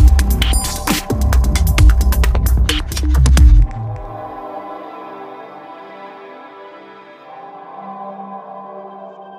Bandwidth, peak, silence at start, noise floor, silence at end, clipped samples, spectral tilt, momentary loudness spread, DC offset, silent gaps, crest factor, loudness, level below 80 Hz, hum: 16 kHz; 0 dBFS; 0 s; -38 dBFS; 0 s; under 0.1%; -5 dB/octave; 23 LU; under 0.1%; none; 14 dB; -15 LUFS; -16 dBFS; none